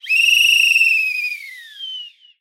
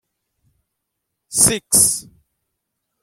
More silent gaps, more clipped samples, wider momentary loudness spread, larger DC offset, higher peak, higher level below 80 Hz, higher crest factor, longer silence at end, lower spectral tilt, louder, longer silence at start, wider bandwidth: neither; neither; first, 20 LU vs 11 LU; neither; second, -4 dBFS vs 0 dBFS; second, under -90 dBFS vs -50 dBFS; second, 14 dB vs 22 dB; second, 0.3 s vs 1 s; second, 14 dB/octave vs -1.5 dB/octave; about the same, -12 LUFS vs -14 LUFS; second, 0.05 s vs 1.3 s; about the same, 16.5 kHz vs 16.5 kHz